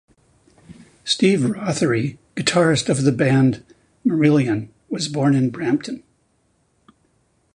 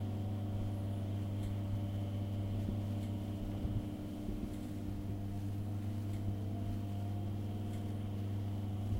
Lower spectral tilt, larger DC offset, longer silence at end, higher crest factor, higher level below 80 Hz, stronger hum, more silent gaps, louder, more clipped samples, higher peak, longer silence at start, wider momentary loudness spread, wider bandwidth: second, -5.5 dB/octave vs -8 dB/octave; neither; first, 1.55 s vs 0 s; about the same, 18 dB vs 14 dB; second, -56 dBFS vs -50 dBFS; neither; neither; first, -19 LUFS vs -40 LUFS; neither; first, -2 dBFS vs -26 dBFS; first, 0.7 s vs 0 s; first, 11 LU vs 3 LU; second, 11 kHz vs 16 kHz